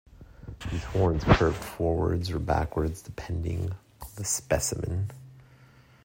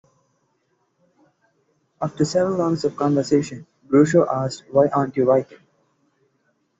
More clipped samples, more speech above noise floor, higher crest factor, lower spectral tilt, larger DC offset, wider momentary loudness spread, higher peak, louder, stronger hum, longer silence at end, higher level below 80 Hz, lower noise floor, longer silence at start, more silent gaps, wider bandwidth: neither; second, 28 dB vs 49 dB; first, 24 dB vs 18 dB; about the same, -5.5 dB/octave vs -6.5 dB/octave; neither; first, 17 LU vs 13 LU; about the same, -4 dBFS vs -4 dBFS; second, -28 LUFS vs -20 LUFS; neither; second, 0.65 s vs 1.25 s; first, -40 dBFS vs -60 dBFS; second, -55 dBFS vs -68 dBFS; second, 0.2 s vs 2 s; neither; first, 16 kHz vs 8 kHz